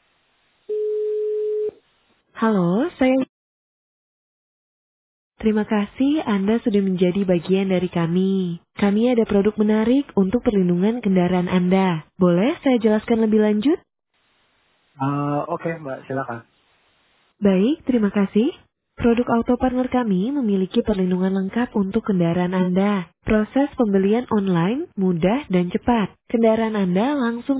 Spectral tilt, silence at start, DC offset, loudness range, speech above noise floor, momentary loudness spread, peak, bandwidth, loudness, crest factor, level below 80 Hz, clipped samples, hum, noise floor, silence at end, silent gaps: -12 dB/octave; 0.7 s; under 0.1%; 5 LU; 45 dB; 7 LU; -6 dBFS; 4 kHz; -20 LUFS; 14 dB; -48 dBFS; under 0.1%; none; -65 dBFS; 0 s; 3.29-5.31 s